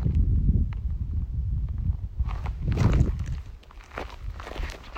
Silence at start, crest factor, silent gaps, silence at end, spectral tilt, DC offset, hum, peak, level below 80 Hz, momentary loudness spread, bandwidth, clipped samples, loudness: 0 s; 16 dB; none; 0 s; -8 dB/octave; under 0.1%; none; -10 dBFS; -30 dBFS; 15 LU; 8.2 kHz; under 0.1%; -29 LUFS